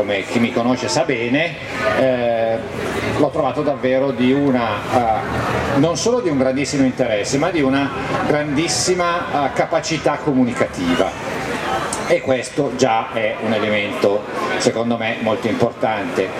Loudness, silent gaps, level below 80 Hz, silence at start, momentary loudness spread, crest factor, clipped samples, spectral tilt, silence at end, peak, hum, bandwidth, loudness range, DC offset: -18 LUFS; none; -44 dBFS; 0 s; 4 LU; 18 dB; under 0.1%; -4.5 dB/octave; 0 s; 0 dBFS; none; 14.5 kHz; 2 LU; under 0.1%